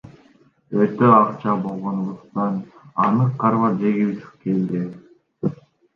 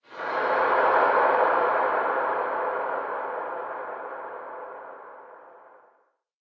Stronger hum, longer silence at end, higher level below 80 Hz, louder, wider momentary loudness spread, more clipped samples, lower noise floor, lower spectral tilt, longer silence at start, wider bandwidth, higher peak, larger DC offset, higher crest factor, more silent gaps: neither; second, 0.45 s vs 0.8 s; first, -64 dBFS vs -70 dBFS; first, -21 LUFS vs -25 LUFS; second, 13 LU vs 19 LU; neither; second, -55 dBFS vs -67 dBFS; first, -10.5 dB/octave vs -5.5 dB/octave; about the same, 0.05 s vs 0.1 s; about the same, 6 kHz vs 6.2 kHz; first, -2 dBFS vs -8 dBFS; neither; about the same, 20 dB vs 18 dB; neither